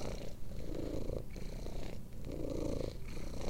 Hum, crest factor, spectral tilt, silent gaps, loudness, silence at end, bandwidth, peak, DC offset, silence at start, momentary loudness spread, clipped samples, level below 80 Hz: none; 14 dB; -6.5 dB/octave; none; -44 LUFS; 0 s; 16 kHz; -24 dBFS; under 0.1%; 0 s; 8 LU; under 0.1%; -44 dBFS